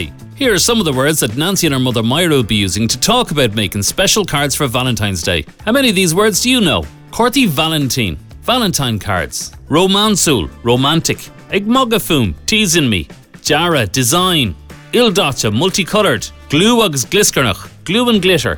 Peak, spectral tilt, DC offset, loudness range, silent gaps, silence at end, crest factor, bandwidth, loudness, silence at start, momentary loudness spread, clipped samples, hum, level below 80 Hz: -2 dBFS; -3.5 dB/octave; under 0.1%; 1 LU; none; 0 s; 12 dB; over 20 kHz; -13 LUFS; 0 s; 7 LU; under 0.1%; none; -36 dBFS